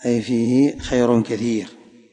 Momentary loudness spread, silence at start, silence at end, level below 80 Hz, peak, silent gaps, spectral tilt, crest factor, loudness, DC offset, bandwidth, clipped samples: 7 LU; 0 s; 0.4 s; -46 dBFS; -4 dBFS; none; -6.5 dB/octave; 16 dB; -19 LUFS; under 0.1%; 9.6 kHz; under 0.1%